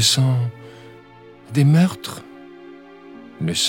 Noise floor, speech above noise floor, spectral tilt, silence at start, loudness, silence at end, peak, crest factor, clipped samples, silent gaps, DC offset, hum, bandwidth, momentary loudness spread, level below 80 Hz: -45 dBFS; 27 dB; -4.5 dB/octave; 0 s; -19 LUFS; 0 s; -2 dBFS; 18 dB; under 0.1%; none; under 0.1%; none; 17 kHz; 26 LU; -60 dBFS